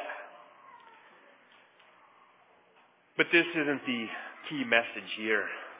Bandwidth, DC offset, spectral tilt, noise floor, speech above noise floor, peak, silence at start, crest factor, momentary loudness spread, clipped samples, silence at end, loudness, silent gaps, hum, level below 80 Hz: 4 kHz; under 0.1%; -1.5 dB/octave; -64 dBFS; 34 dB; -10 dBFS; 0 s; 24 dB; 16 LU; under 0.1%; 0 s; -29 LUFS; none; none; -88 dBFS